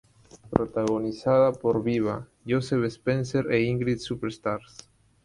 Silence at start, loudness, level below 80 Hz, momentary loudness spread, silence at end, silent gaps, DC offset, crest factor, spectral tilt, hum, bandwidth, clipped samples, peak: 0.35 s; -26 LUFS; -54 dBFS; 9 LU; 0.65 s; none; under 0.1%; 26 dB; -7 dB/octave; none; 11.5 kHz; under 0.1%; 0 dBFS